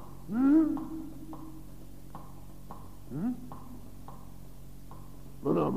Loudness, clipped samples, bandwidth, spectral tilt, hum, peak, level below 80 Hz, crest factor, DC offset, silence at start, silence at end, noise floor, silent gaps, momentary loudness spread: -30 LUFS; under 0.1%; 15.5 kHz; -8.5 dB/octave; none; -14 dBFS; -54 dBFS; 18 dB; 0.6%; 0 s; 0 s; -49 dBFS; none; 25 LU